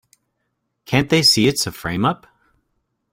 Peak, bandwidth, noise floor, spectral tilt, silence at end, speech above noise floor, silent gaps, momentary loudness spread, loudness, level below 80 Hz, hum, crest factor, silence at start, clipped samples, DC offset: -2 dBFS; 16.5 kHz; -73 dBFS; -4 dB/octave; 1 s; 56 dB; none; 10 LU; -17 LUFS; -50 dBFS; none; 18 dB; 0.9 s; under 0.1%; under 0.1%